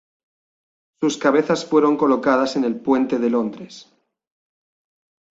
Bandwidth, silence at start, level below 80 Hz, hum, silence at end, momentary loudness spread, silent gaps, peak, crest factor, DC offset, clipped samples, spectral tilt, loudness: 8 kHz; 1 s; -64 dBFS; none; 1.5 s; 8 LU; none; -2 dBFS; 18 dB; under 0.1%; under 0.1%; -5 dB/octave; -19 LUFS